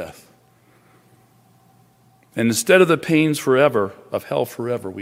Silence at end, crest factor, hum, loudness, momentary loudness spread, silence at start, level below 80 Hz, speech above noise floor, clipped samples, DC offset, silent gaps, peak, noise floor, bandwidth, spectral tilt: 0 s; 18 dB; none; -18 LUFS; 13 LU; 0 s; -64 dBFS; 37 dB; under 0.1%; under 0.1%; none; -2 dBFS; -55 dBFS; 16 kHz; -5 dB/octave